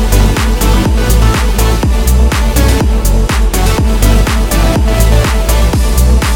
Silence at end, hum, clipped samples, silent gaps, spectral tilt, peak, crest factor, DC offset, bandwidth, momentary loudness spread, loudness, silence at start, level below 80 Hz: 0 s; none; 0.8%; none; -5 dB/octave; 0 dBFS; 8 dB; under 0.1%; 18 kHz; 2 LU; -11 LUFS; 0 s; -10 dBFS